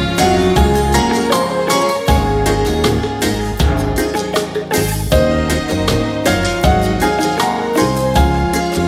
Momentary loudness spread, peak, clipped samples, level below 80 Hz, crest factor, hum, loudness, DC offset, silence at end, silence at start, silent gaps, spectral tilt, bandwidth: 4 LU; 0 dBFS; under 0.1%; -22 dBFS; 14 dB; none; -15 LUFS; under 0.1%; 0 s; 0 s; none; -5 dB/octave; 16.5 kHz